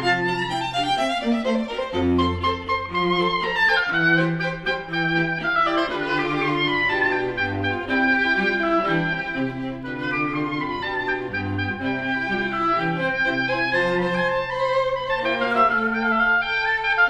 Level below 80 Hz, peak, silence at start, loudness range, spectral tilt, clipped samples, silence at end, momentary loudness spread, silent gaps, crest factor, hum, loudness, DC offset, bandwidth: -46 dBFS; -6 dBFS; 0 s; 3 LU; -5.5 dB/octave; under 0.1%; 0 s; 7 LU; none; 16 dB; none; -22 LUFS; under 0.1%; 11.5 kHz